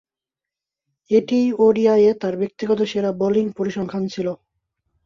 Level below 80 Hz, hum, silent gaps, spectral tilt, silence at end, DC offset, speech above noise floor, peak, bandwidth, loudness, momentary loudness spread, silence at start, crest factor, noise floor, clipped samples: -62 dBFS; none; none; -7 dB/octave; 0.7 s; under 0.1%; 70 dB; -4 dBFS; 7.2 kHz; -19 LUFS; 10 LU; 1.1 s; 16 dB; -88 dBFS; under 0.1%